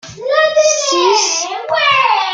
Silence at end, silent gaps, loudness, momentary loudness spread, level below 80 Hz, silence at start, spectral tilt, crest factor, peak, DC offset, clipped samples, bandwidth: 0 s; none; -12 LUFS; 6 LU; -60 dBFS; 0.05 s; -0.5 dB/octave; 14 dB; 0 dBFS; under 0.1%; under 0.1%; 9.6 kHz